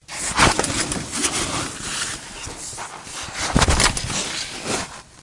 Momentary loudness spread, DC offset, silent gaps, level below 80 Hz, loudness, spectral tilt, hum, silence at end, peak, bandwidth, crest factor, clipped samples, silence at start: 14 LU; under 0.1%; none; -34 dBFS; -21 LUFS; -2.5 dB/octave; none; 0 s; 0 dBFS; 11.5 kHz; 22 dB; under 0.1%; 0.1 s